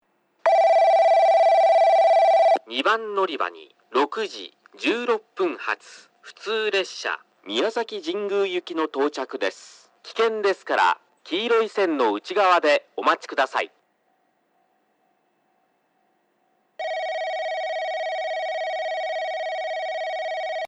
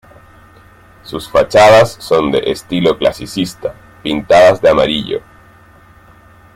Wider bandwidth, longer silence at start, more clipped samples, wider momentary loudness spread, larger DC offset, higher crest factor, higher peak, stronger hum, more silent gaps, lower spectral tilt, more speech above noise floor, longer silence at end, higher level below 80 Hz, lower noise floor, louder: second, 9.4 kHz vs 16 kHz; second, 0.45 s vs 1.05 s; neither; second, 12 LU vs 17 LU; neither; about the same, 18 dB vs 14 dB; second, -6 dBFS vs 0 dBFS; neither; neither; second, -2.5 dB/octave vs -5 dB/octave; first, 44 dB vs 31 dB; second, 0 s vs 1.35 s; second, -86 dBFS vs -42 dBFS; first, -68 dBFS vs -43 dBFS; second, -22 LUFS vs -12 LUFS